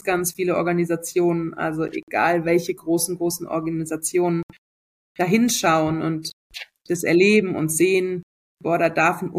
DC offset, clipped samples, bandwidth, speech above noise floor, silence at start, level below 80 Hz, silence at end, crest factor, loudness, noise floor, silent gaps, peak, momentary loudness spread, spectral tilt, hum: under 0.1%; under 0.1%; 15.5 kHz; over 69 dB; 0.05 s; -58 dBFS; 0 s; 16 dB; -21 LUFS; under -90 dBFS; 2.03-2.07 s, 4.43-4.49 s, 4.58-5.15 s, 6.33-6.50 s, 8.23-8.57 s; -4 dBFS; 10 LU; -4.5 dB/octave; none